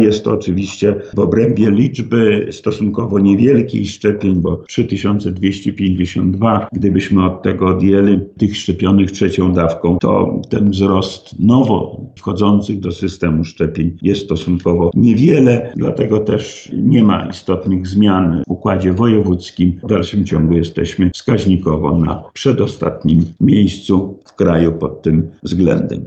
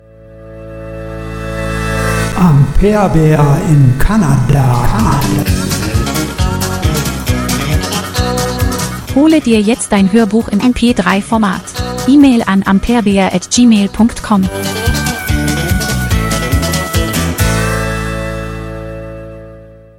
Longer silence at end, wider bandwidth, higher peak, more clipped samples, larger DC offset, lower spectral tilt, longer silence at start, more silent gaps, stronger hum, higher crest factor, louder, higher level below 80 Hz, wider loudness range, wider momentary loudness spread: second, 0 s vs 0.25 s; second, 8.2 kHz vs 17.5 kHz; about the same, 0 dBFS vs 0 dBFS; second, under 0.1% vs 0.3%; neither; first, -7.5 dB/octave vs -5.5 dB/octave; second, 0 s vs 0.25 s; neither; neither; about the same, 12 dB vs 12 dB; about the same, -14 LUFS vs -12 LUFS; second, -38 dBFS vs -22 dBFS; about the same, 2 LU vs 4 LU; second, 7 LU vs 13 LU